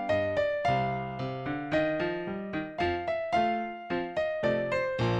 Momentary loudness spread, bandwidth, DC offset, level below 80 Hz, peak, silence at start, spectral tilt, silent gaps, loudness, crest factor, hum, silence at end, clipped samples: 7 LU; 8.8 kHz; under 0.1%; -54 dBFS; -16 dBFS; 0 s; -7 dB/octave; none; -30 LUFS; 14 dB; none; 0 s; under 0.1%